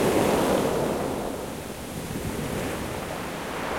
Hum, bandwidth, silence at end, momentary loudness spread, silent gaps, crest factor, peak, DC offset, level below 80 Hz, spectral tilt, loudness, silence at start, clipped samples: none; 16.5 kHz; 0 s; 12 LU; none; 20 dB; -8 dBFS; 0.1%; -46 dBFS; -5 dB/octave; -28 LUFS; 0 s; under 0.1%